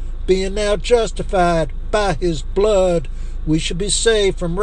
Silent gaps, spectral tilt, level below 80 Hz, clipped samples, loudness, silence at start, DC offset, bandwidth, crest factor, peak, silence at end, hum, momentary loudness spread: none; -4.5 dB/octave; -24 dBFS; under 0.1%; -18 LUFS; 0 s; under 0.1%; 10 kHz; 16 dB; -2 dBFS; 0 s; none; 6 LU